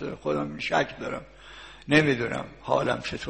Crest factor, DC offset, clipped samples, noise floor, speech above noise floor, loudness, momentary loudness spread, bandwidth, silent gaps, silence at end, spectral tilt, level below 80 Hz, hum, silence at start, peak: 20 dB; 0.1%; under 0.1%; -46 dBFS; 20 dB; -26 LUFS; 22 LU; 8.8 kHz; none; 0 s; -5.5 dB/octave; -54 dBFS; none; 0 s; -6 dBFS